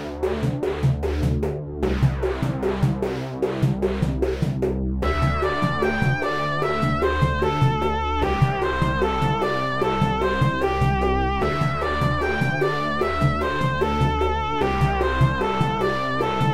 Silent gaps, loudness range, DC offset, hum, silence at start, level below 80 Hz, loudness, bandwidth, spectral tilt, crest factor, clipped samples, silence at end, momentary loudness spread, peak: none; 2 LU; 1%; none; 0 s; -32 dBFS; -22 LUFS; 14 kHz; -7 dB/octave; 14 dB; under 0.1%; 0 s; 3 LU; -6 dBFS